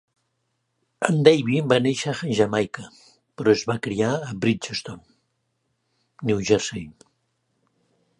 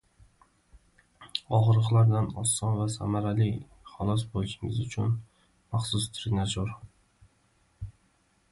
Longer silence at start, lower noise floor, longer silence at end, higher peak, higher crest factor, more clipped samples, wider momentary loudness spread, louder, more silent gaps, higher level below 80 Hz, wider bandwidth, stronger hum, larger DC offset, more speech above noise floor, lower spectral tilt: second, 1 s vs 1.2 s; first, -74 dBFS vs -68 dBFS; first, 1.3 s vs 0.6 s; first, 0 dBFS vs -10 dBFS; first, 24 dB vs 18 dB; neither; about the same, 14 LU vs 16 LU; first, -22 LUFS vs -28 LUFS; neither; second, -58 dBFS vs -50 dBFS; about the same, 11.5 kHz vs 11.5 kHz; neither; neither; first, 52 dB vs 41 dB; about the same, -5.5 dB/octave vs -5.5 dB/octave